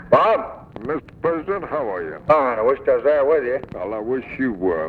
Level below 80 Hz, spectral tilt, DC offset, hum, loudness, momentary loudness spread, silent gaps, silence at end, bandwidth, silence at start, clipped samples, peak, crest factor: -50 dBFS; -8 dB/octave; under 0.1%; none; -21 LUFS; 11 LU; none; 0 s; 5.2 kHz; 0 s; under 0.1%; 0 dBFS; 20 dB